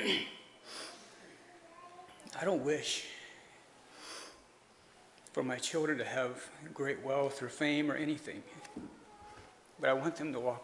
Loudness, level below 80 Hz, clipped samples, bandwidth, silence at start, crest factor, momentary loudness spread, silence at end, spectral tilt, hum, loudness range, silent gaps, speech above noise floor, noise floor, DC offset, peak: -37 LUFS; -78 dBFS; under 0.1%; 11.5 kHz; 0 s; 22 dB; 22 LU; 0 s; -3.5 dB/octave; none; 4 LU; none; 27 dB; -63 dBFS; under 0.1%; -18 dBFS